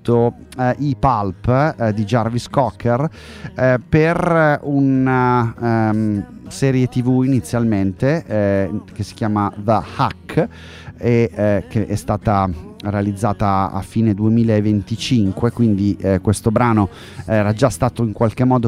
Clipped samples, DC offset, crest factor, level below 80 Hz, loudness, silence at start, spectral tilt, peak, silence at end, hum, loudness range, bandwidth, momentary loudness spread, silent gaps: under 0.1%; under 0.1%; 16 dB; -40 dBFS; -18 LUFS; 0.05 s; -7.5 dB/octave; -2 dBFS; 0 s; none; 3 LU; 14 kHz; 7 LU; none